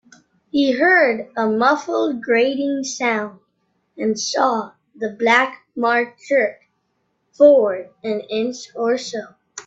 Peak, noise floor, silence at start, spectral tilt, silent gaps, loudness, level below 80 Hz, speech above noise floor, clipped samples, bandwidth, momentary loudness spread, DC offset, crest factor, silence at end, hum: 0 dBFS; -69 dBFS; 0.55 s; -3.5 dB/octave; none; -18 LUFS; -68 dBFS; 51 dB; under 0.1%; 8 kHz; 13 LU; under 0.1%; 20 dB; 0.05 s; none